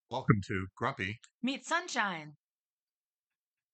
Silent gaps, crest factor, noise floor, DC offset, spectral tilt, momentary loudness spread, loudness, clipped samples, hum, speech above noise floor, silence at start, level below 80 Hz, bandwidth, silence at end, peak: 1.34-1.39 s; 28 dB; under -90 dBFS; under 0.1%; -5 dB/octave; 8 LU; -34 LUFS; under 0.1%; none; over 56 dB; 0.1 s; -68 dBFS; 9 kHz; 1.4 s; -8 dBFS